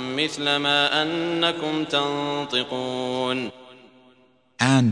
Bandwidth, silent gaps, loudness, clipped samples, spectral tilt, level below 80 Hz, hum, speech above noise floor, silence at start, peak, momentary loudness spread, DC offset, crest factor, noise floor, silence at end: 10 kHz; none; -23 LUFS; under 0.1%; -4.5 dB/octave; -66 dBFS; none; 36 dB; 0 s; -4 dBFS; 8 LU; under 0.1%; 20 dB; -59 dBFS; 0 s